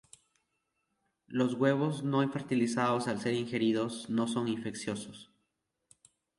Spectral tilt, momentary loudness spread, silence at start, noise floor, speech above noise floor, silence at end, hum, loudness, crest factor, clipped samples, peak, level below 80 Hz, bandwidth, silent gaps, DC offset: -6 dB/octave; 10 LU; 1.3 s; -82 dBFS; 51 dB; 1.15 s; none; -32 LUFS; 20 dB; under 0.1%; -14 dBFS; -74 dBFS; 11.5 kHz; none; under 0.1%